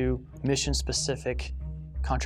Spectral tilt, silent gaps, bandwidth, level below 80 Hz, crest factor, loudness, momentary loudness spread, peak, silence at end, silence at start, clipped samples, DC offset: -4 dB/octave; none; 13.5 kHz; -34 dBFS; 16 dB; -30 LUFS; 11 LU; -12 dBFS; 0 s; 0 s; under 0.1%; under 0.1%